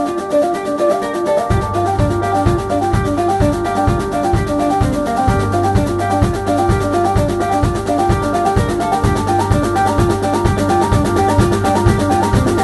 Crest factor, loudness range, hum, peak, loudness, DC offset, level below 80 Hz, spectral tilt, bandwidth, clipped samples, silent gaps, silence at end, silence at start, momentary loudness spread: 14 dB; 2 LU; none; 0 dBFS; -15 LUFS; under 0.1%; -26 dBFS; -6.5 dB/octave; 12.5 kHz; under 0.1%; none; 0 s; 0 s; 3 LU